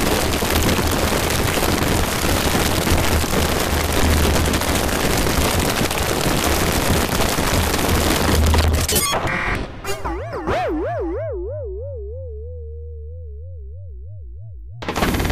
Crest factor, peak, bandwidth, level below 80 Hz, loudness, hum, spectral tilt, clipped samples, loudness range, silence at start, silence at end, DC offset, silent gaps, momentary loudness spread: 14 dB; -4 dBFS; 16 kHz; -26 dBFS; -19 LUFS; none; -4 dB/octave; under 0.1%; 11 LU; 0 s; 0 s; under 0.1%; none; 18 LU